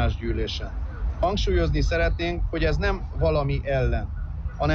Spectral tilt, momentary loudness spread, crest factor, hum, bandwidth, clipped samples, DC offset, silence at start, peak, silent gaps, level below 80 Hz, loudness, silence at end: -6.5 dB/octave; 8 LU; 12 dB; none; 7 kHz; under 0.1%; under 0.1%; 0 s; -12 dBFS; none; -28 dBFS; -26 LUFS; 0 s